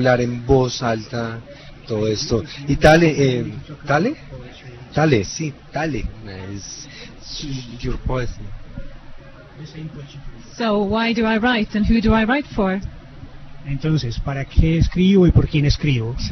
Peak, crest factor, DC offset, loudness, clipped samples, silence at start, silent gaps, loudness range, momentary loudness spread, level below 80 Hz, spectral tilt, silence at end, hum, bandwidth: 0 dBFS; 20 dB; under 0.1%; -19 LUFS; under 0.1%; 0 s; none; 12 LU; 22 LU; -30 dBFS; -6 dB/octave; 0 s; none; 11 kHz